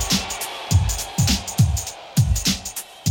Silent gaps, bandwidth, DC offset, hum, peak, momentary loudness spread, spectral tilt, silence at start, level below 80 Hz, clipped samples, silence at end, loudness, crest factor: none; 18.5 kHz; under 0.1%; none; -6 dBFS; 7 LU; -3.5 dB/octave; 0 s; -30 dBFS; under 0.1%; 0 s; -21 LUFS; 16 dB